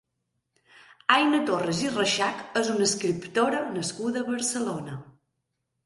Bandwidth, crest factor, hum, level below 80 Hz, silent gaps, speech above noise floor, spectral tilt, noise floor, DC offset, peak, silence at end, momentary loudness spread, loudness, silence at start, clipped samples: 11.5 kHz; 24 dB; none; -68 dBFS; none; 54 dB; -3 dB/octave; -80 dBFS; under 0.1%; -4 dBFS; 0.75 s; 9 LU; -26 LUFS; 1.1 s; under 0.1%